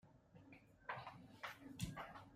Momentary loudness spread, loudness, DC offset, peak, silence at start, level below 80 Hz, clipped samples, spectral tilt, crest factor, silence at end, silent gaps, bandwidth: 15 LU; -53 LUFS; under 0.1%; -32 dBFS; 0.05 s; -70 dBFS; under 0.1%; -4.5 dB/octave; 22 dB; 0 s; none; 15.5 kHz